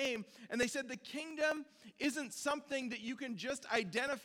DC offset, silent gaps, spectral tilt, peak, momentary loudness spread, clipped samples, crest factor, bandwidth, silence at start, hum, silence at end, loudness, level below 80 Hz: under 0.1%; none; -3 dB/octave; -20 dBFS; 8 LU; under 0.1%; 20 dB; 18 kHz; 0 s; none; 0 s; -39 LUFS; -76 dBFS